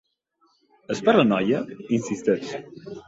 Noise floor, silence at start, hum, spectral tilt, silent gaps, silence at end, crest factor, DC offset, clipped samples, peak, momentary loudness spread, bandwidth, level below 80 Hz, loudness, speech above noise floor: -67 dBFS; 0.9 s; none; -6 dB/octave; none; 0.05 s; 20 dB; under 0.1%; under 0.1%; -4 dBFS; 16 LU; 8 kHz; -64 dBFS; -23 LUFS; 44 dB